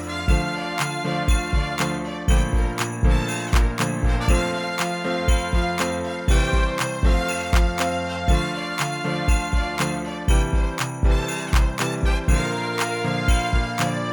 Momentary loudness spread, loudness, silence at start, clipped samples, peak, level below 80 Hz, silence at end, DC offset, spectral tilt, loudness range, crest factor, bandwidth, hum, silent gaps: 4 LU; -23 LUFS; 0 s; under 0.1%; -6 dBFS; -24 dBFS; 0 s; under 0.1%; -5 dB/octave; 1 LU; 16 dB; 19 kHz; none; none